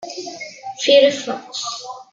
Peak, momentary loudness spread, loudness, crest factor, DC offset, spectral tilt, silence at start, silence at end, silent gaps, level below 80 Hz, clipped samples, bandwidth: -2 dBFS; 19 LU; -17 LUFS; 18 dB; under 0.1%; -1.5 dB/octave; 0 s; 0.1 s; none; -74 dBFS; under 0.1%; 7.8 kHz